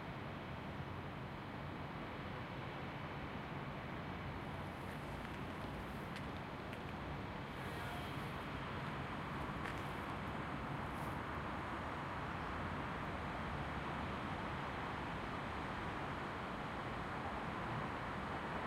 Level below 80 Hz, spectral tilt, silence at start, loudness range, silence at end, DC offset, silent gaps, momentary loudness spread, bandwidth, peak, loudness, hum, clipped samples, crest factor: -56 dBFS; -6.5 dB/octave; 0 s; 3 LU; 0 s; under 0.1%; none; 4 LU; 16 kHz; -26 dBFS; -45 LUFS; none; under 0.1%; 18 dB